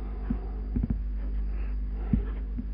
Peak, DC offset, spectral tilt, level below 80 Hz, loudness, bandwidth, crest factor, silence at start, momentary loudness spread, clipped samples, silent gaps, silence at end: -10 dBFS; under 0.1%; -10 dB/octave; -30 dBFS; -33 LUFS; 3.1 kHz; 20 dB; 0 s; 5 LU; under 0.1%; none; 0 s